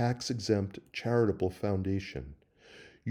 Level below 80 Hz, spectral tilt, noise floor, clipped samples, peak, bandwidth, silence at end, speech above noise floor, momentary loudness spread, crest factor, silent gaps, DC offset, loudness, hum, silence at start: -58 dBFS; -6.5 dB/octave; -56 dBFS; under 0.1%; -14 dBFS; 14 kHz; 0 s; 25 dB; 14 LU; 18 dB; none; under 0.1%; -32 LUFS; none; 0 s